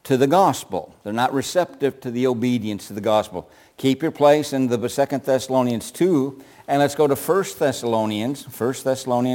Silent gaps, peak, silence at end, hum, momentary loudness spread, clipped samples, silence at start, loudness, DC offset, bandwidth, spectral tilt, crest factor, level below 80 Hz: none; -4 dBFS; 0 s; none; 10 LU; under 0.1%; 0.05 s; -21 LUFS; under 0.1%; 17 kHz; -5.5 dB/octave; 18 dB; -62 dBFS